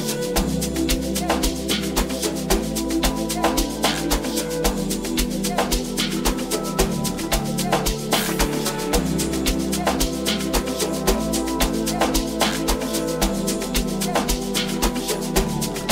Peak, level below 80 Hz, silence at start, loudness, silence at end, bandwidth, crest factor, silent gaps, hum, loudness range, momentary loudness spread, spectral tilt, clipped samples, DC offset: -2 dBFS; -30 dBFS; 0 s; -22 LUFS; 0 s; 16.5 kHz; 20 dB; none; none; 1 LU; 2 LU; -3.5 dB/octave; under 0.1%; under 0.1%